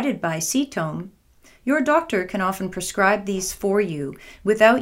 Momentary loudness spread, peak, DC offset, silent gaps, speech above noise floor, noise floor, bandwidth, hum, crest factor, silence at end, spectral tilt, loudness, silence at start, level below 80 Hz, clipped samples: 11 LU; -2 dBFS; under 0.1%; none; 32 dB; -54 dBFS; 16 kHz; none; 20 dB; 0 s; -4 dB/octave; -22 LUFS; 0 s; -52 dBFS; under 0.1%